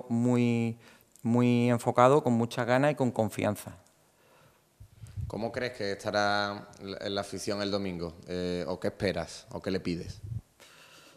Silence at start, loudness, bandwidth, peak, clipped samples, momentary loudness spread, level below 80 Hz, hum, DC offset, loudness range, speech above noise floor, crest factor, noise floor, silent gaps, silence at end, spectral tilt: 0.05 s; -30 LUFS; 14.5 kHz; -6 dBFS; under 0.1%; 15 LU; -60 dBFS; none; under 0.1%; 8 LU; 34 dB; 24 dB; -63 dBFS; none; 0.5 s; -6 dB/octave